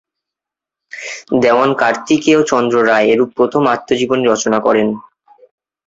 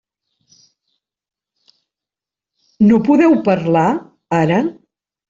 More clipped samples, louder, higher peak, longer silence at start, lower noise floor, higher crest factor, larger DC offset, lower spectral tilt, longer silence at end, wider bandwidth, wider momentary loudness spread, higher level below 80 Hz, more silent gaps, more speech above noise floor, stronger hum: neither; about the same, -13 LUFS vs -15 LUFS; about the same, 0 dBFS vs -2 dBFS; second, 0.95 s vs 2.8 s; about the same, -85 dBFS vs -88 dBFS; about the same, 14 dB vs 14 dB; neither; second, -4.5 dB/octave vs -8 dB/octave; first, 0.85 s vs 0.55 s; about the same, 8 kHz vs 7.6 kHz; first, 13 LU vs 9 LU; about the same, -56 dBFS vs -56 dBFS; neither; about the same, 73 dB vs 75 dB; neither